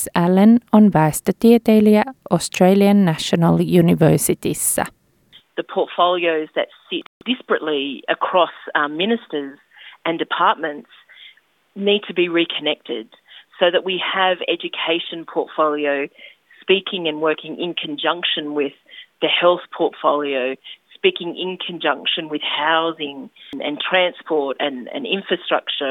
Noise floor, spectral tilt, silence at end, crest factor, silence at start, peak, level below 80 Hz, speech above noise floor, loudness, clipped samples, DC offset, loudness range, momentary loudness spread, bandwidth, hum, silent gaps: -52 dBFS; -4.5 dB/octave; 0 s; 18 dB; 0 s; -2 dBFS; -58 dBFS; 34 dB; -18 LUFS; under 0.1%; under 0.1%; 7 LU; 13 LU; 17.5 kHz; none; 7.06-7.21 s